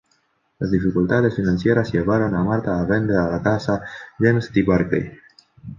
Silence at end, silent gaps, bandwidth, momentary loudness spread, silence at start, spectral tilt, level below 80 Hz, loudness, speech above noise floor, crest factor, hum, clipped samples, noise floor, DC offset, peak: 0.05 s; none; 7.2 kHz; 6 LU; 0.6 s; -8.5 dB/octave; -42 dBFS; -20 LUFS; 46 dB; 16 dB; none; under 0.1%; -65 dBFS; under 0.1%; -4 dBFS